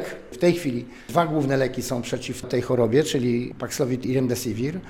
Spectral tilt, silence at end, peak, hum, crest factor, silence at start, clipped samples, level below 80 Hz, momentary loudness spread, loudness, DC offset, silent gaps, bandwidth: -5.5 dB/octave; 0 s; -4 dBFS; none; 20 dB; 0 s; under 0.1%; -52 dBFS; 9 LU; -24 LUFS; under 0.1%; none; 17 kHz